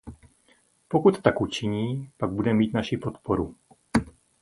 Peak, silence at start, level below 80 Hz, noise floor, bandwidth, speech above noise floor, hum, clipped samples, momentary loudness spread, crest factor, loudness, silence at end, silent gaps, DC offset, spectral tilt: -2 dBFS; 0.05 s; -48 dBFS; -63 dBFS; 11.5 kHz; 39 dB; none; under 0.1%; 9 LU; 26 dB; -26 LUFS; 0.35 s; none; under 0.1%; -7 dB/octave